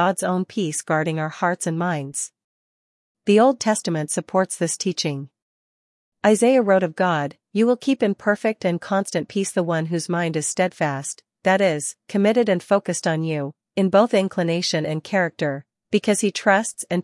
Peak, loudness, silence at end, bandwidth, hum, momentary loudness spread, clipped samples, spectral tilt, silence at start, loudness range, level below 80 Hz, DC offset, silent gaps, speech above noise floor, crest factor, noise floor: -4 dBFS; -21 LUFS; 0 s; 12 kHz; none; 9 LU; under 0.1%; -4.5 dB/octave; 0 s; 2 LU; -72 dBFS; under 0.1%; 2.44-3.15 s, 5.42-6.12 s; over 69 dB; 18 dB; under -90 dBFS